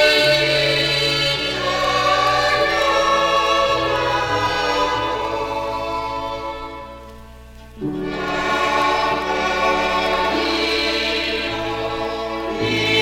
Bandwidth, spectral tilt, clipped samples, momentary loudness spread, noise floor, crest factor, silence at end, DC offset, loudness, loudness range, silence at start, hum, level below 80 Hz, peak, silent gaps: 16.5 kHz; -3.5 dB/octave; under 0.1%; 9 LU; -39 dBFS; 16 dB; 0 s; under 0.1%; -18 LUFS; 8 LU; 0 s; none; -40 dBFS; -4 dBFS; none